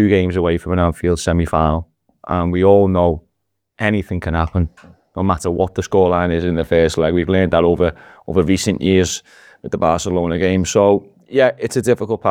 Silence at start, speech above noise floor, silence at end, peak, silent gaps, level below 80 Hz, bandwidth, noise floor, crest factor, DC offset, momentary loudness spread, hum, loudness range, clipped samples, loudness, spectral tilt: 0 s; 58 dB; 0 s; 0 dBFS; none; -34 dBFS; 15 kHz; -73 dBFS; 16 dB; under 0.1%; 7 LU; none; 2 LU; under 0.1%; -17 LUFS; -6 dB/octave